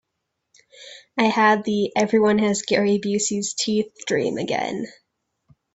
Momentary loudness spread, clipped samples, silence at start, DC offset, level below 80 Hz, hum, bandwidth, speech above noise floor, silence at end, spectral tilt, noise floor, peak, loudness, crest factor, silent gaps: 12 LU; under 0.1%; 0.8 s; under 0.1%; -64 dBFS; none; 8.2 kHz; 57 dB; 0.85 s; -4 dB/octave; -78 dBFS; -4 dBFS; -21 LUFS; 18 dB; none